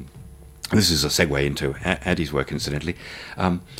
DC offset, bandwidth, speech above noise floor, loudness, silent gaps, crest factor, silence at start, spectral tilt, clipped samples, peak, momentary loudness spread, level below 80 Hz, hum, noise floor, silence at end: under 0.1%; 16.5 kHz; 20 dB; -22 LUFS; none; 20 dB; 0 s; -4 dB/octave; under 0.1%; -4 dBFS; 15 LU; -40 dBFS; none; -43 dBFS; 0 s